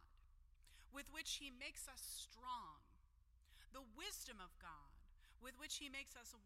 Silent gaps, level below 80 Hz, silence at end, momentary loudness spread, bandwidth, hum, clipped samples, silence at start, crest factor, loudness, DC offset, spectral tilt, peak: none; -68 dBFS; 0 s; 13 LU; 16 kHz; none; under 0.1%; 0 s; 22 dB; -53 LUFS; under 0.1%; -0.5 dB/octave; -34 dBFS